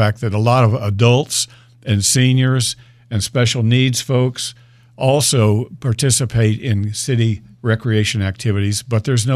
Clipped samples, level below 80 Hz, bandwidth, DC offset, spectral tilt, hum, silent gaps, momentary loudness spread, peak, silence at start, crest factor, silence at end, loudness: under 0.1%; -48 dBFS; 15 kHz; under 0.1%; -5 dB/octave; none; none; 8 LU; -2 dBFS; 0 s; 14 dB; 0 s; -16 LUFS